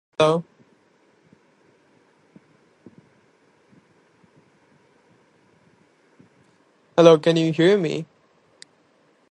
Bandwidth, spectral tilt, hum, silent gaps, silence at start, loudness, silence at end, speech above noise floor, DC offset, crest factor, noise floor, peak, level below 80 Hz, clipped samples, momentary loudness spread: 10.5 kHz; -6 dB/octave; none; none; 0.2 s; -18 LUFS; 1.25 s; 44 dB; under 0.1%; 24 dB; -61 dBFS; 0 dBFS; -74 dBFS; under 0.1%; 14 LU